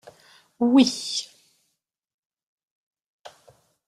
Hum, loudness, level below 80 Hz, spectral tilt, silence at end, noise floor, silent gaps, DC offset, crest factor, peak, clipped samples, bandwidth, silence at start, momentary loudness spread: none; -21 LUFS; -72 dBFS; -3.5 dB/octave; 0.6 s; -78 dBFS; 2.14-2.30 s, 2.43-2.91 s, 3.06-3.24 s; under 0.1%; 22 dB; -6 dBFS; under 0.1%; 12.5 kHz; 0.6 s; 13 LU